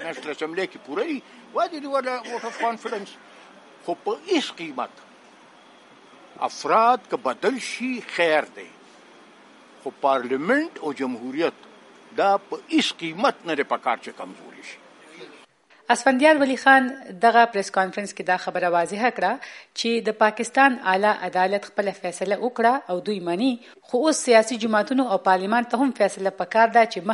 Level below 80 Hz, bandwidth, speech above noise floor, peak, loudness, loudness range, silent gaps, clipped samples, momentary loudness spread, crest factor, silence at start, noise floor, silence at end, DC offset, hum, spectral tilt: -80 dBFS; 11.5 kHz; 32 dB; -2 dBFS; -22 LUFS; 9 LU; none; under 0.1%; 15 LU; 22 dB; 0 s; -54 dBFS; 0 s; under 0.1%; none; -3.5 dB/octave